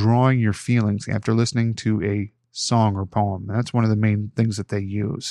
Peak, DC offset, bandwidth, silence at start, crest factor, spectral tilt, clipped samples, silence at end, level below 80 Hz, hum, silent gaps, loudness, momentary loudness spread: -4 dBFS; under 0.1%; 11 kHz; 0 s; 16 dB; -6.5 dB/octave; under 0.1%; 0 s; -56 dBFS; none; none; -22 LUFS; 7 LU